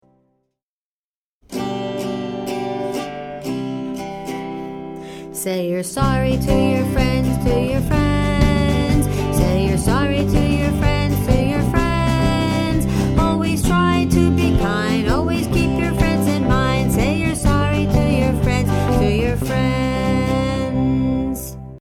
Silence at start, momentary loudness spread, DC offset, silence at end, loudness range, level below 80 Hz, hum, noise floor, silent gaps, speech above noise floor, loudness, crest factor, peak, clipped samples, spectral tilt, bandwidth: 1.5 s; 10 LU; under 0.1%; 0 s; 9 LU; -26 dBFS; none; under -90 dBFS; none; over 73 dB; -18 LUFS; 18 dB; 0 dBFS; under 0.1%; -6.5 dB/octave; 18 kHz